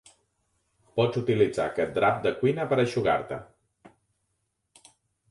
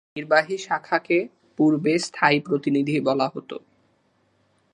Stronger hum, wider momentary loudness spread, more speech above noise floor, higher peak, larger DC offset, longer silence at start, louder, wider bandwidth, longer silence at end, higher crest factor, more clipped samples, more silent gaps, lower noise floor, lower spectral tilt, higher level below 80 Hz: neither; second, 6 LU vs 12 LU; first, 53 dB vs 43 dB; second, -10 dBFS vs -2 dBFS; neither; first, 0.95 s vs 0.15 s; second, -26 LUFS vs -22 LUFS; about the same, 11.5 kHz vs 10.5 kHz; first, 1.4 s vs 1.15 s; about the same, 20 dB vs 22 dB; neither; neither; first, -78 dBFS vs -65 dBFS; about the same, -6.5 dB/octave vs -5.5 dB/octave; first, -60 dBFS vs -72 dBFS